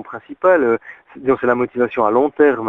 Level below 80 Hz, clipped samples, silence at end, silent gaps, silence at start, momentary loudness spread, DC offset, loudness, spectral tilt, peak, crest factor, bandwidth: -56 dBFS; under 0.1%; 0 s; none; 0 s; 8 LU; under 0.1%; -17 LUFS; -8.5 dB/octave; -2 dBFS; 16 dB; 3.9 kHz